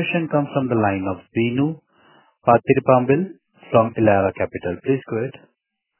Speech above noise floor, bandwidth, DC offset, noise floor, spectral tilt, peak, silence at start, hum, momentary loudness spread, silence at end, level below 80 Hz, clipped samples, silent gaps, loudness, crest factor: 56 dB; 3.2 kHz; under 0.1%; -74 dBFS; -11.5 dB/octave; 0 dBFS; 0 s; none; 10 LU; 0.7 s; -50 dBFS; under 0.1%; none; -20 LUFS; 20 dB